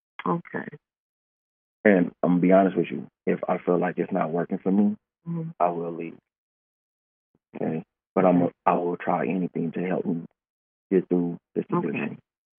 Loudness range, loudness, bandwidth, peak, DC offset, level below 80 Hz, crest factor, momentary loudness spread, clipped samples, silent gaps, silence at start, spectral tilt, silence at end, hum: 6 LU; -25 LUFS; 3.6 kHz; -4 dBFS; under 0.1%; -78 dBFS; 22 dB; 13 LU; under 0.1%; 0.98-1.84 s, 6.38-7.34 s, 8.07-8.16 s, 10.50-10.90 s; 0.25 s; -8 dB/octave; 0.45 s; none